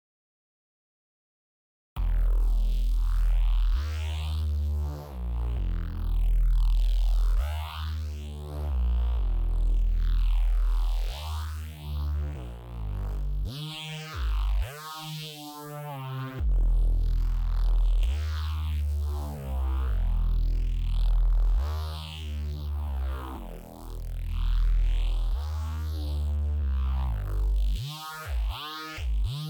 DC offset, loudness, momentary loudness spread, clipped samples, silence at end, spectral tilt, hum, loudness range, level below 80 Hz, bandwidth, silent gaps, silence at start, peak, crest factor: under 0.1%; -31 LUFS; 9 LU; under 0.1%; 0 s; -6 dB/octave; none; 4 LU; -26 dBFS; 16 kHz; none; 1.95 s; -16 dBFS; 10 dB